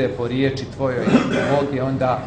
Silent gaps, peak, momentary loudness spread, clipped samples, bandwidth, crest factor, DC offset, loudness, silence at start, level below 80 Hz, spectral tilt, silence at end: none; -2 dBFS; 5 LU; under 0.1%; 9 kHz; 16 dB; under 0.1%; -20 LUFS; 0 s; -46 dBFS; -7 dB/octave; 0 s